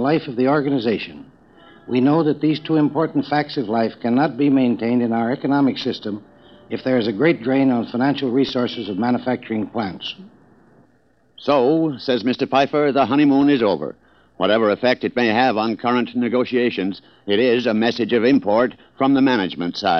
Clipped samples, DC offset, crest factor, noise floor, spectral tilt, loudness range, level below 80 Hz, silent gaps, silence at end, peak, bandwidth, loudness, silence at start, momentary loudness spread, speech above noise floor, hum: under 0.1%; under 0.1%; 16 dB; -59 dBFS; -7.5 dB/octave; 4 LU; -62 dBFS; none; 0 s; -2 dBFS; 6.4 kHz; -19 LUFS; 0 s; 9 LU; 41 dB; none